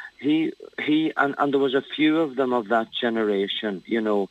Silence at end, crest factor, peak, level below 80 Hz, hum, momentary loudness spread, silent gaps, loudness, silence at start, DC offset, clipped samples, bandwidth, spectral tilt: 0.05 s; 18 dB; -6 dBFS; -74 dBFS; none; 5 LU; none; -23 LUFS; 0 s; under 0.1%; under 0.1%; 8 kHz; -6.5 dB/octave